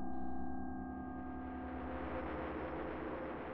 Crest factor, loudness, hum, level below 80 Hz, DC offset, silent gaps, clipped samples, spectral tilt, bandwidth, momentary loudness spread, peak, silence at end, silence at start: 12 dB; -44 LUFS; none; -54 dBFS; under 0.1%; none; under 0.1%; -6.5 dB/octave; 5.6 kHz; 3 LU; -30 dBFS; 0 s; 0 s